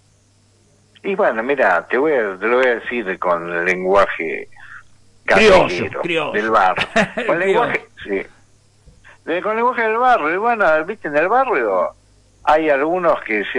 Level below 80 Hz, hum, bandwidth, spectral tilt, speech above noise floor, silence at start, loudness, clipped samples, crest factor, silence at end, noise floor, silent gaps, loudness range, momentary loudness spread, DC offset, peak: -46 dBFS; none; 11.5 kHz; -5 dB/octave; 38 dB; 1.05 s; -17 LUFS; under 0.1%; 16 dB; 0 s; -55 dBFS; none; 3 LU; 10 LU; under 0.1%; -2 dBFS